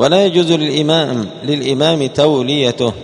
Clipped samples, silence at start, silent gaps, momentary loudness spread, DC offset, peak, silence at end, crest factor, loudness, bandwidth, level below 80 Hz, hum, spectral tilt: under 0.1%; 0 s; none; 7 LU; under 0.1%; 0 dBFS; 0 s; 14 dB; -14 LUFS; 10.5 kHz; -52 dBFS; none; -5.5 dB/octave